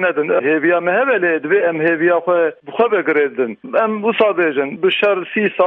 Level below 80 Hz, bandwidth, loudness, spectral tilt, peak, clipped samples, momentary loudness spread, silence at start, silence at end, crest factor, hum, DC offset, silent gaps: -70 dBFS; 4.2 kHz; -16 LUFS; -8 dB/octave; -2 dBFS; under 0.1%; 4 LU; 0 s; 0 s; 14 dB; none; under 0.1%; none